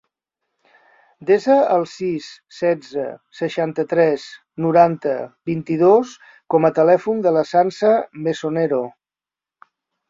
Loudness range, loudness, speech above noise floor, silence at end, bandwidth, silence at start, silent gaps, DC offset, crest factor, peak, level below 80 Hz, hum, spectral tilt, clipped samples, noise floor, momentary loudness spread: 4 LU; -18 LUFS; over 72 dB; 1.2 s; 7.8 kHz; 1.2 s; none; under 0.1%; 18 dB; -2 dBFS; -64 dBFS; none; -7 dB/octave; under 0.1%; under -90 dBFS; 13 LU